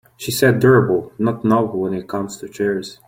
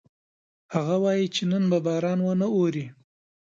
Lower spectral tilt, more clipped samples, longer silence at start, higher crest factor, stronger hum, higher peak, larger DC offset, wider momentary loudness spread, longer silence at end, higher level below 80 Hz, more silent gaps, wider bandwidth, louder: about the same, -6 dB/octave vs -6.5 dB/octave; neither; second, 0.2 s vs 0.7 s; about the same, 16 dB vs 16 dB; neither; first, -2 dBFS vs -10 dBFS; neither; first, 12 LU vs 7 LU; second, 0.15 s vs 0.5 s; first, -52 dBFS vs -70 dBFS; neither; first, 16.5 kHz vs 7.6 kHz; first, -18 LUFS vs -25 LUFS